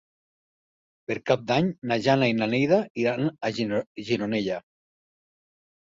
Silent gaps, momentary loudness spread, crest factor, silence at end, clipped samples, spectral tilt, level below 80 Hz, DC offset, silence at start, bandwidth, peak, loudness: 2.90-2.95 s, 3.87-3.95 s; 10 LU; 20 dB; 1.35 s; under 0.1%; -6.5 dB/octave; -64 dBFS; under 0.1%; 1.1 s; 7.8 kHz; -6 dBFS; -25 LUFS